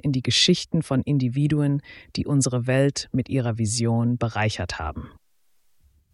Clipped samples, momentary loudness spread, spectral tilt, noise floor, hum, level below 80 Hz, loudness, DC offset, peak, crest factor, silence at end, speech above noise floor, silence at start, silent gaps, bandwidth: under 0.1%; 11 LU; -5 dB/octave; -64 dBFS; none; -46 dBFS; -23 LUFS; under 0.1%; -6 dBFS; 18 dB; 1.05 s; 41 dB; 0.05 s; none; 12 kHz